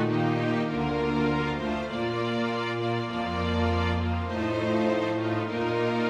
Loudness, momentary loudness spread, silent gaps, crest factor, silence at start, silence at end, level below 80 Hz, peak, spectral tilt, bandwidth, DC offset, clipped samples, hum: -27 LUFS; 4 LU; none; 14 dB; 0 s; 0 s; -46 dBFS; -14 dBFS; -7 dB/octave; 10 kHz; under 0.1%; under 0.1%; none